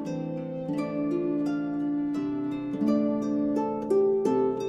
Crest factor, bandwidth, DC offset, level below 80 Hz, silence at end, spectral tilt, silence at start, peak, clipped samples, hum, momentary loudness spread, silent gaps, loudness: 14 dB; 9.8 kHz; under 0.1%; -62 dBFS; 0 s; -8.5 dB/octave; 0 s; -12 dBFS; under 0.1%; none; 8 LU; none; -28 LUFS